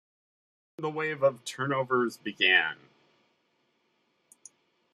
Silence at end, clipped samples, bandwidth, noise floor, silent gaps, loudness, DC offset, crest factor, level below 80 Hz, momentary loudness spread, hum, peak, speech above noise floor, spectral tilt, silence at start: 2.2 s; under 0.1%; 14.5 kHz; -73 dBFS; none; -27 LUFS; under 0.1%; 22 dB; -78 dBFS; 13 LU; none; -8 dBFS; 45 dB; -4 dB/octave; 0.8 s